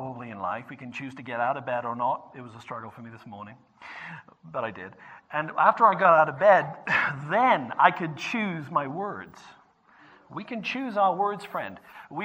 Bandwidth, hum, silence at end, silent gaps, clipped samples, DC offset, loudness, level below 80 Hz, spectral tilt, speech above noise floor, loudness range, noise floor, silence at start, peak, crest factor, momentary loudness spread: 9.2 kHz; none; 0 s; none; under 0.1%; under 0.1%; -25 LUFS; -74 dBFS; -6 dB/octave; 31 dB; 13 LU; -57 dBFS; 0 s; -4 dBFS; 24 dB; 24 LU